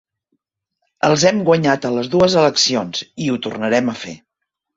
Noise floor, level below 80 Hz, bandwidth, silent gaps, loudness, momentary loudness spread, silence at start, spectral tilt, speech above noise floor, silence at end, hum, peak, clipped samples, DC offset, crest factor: -79 dBFS; -54 dBFS; 8 kHz; none; -16 LUFS; 10 LU; 1.05 s; -4 dB/octave; 63 dB; 0.6 s; none; -2 dBFS; under 0.1%; under 0.1%; 16 dB